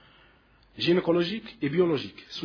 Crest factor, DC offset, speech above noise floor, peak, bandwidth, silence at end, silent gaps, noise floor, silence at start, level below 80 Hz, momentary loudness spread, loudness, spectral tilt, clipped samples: 16 dB; under 0.1%; 33 dB; -12 dBFS; 5.4 kHz; 0 s; none; -60 dBFS; 0.75 s; -62 dBFS; 8 LU; -27 LUFS; -7 dB/octave; under 0.1%